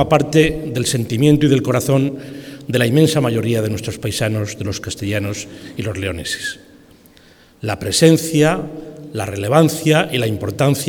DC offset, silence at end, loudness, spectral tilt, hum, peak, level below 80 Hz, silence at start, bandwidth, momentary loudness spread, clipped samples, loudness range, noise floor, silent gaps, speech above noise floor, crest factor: under 0.1%; 0 s; -17 LUFS; -5.5 dB/octave; none; 0 dBFS; -44 dBFS; 0 s; 19 kHz; 14 LU; under 0.1%; 7 LU; -48 dBFS; none; 31 dB; 18 dB